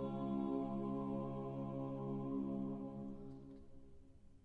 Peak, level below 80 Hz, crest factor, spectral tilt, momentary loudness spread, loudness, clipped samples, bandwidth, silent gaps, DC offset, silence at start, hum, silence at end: -30 dBFS; -64 dBFS; 14 dB; -10.5 dB/octave; 16 LU; -44 LUFS; under 0.1%; 4.6 kHz; none; under 0.1%; 0 s; none; 0.05 s